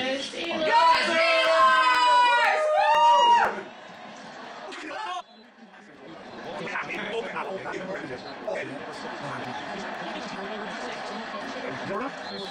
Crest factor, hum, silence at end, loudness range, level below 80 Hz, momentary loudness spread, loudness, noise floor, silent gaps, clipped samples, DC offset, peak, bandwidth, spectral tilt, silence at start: 16 dB; none; 0 s; 15 LU; -68 dBFS; 20 LU; -24 LUFS; -50 dBFS; none; under 0.1%; under 0.1%; -10 dBFS; 11 kHz; -2.5 dB/octave; 0 s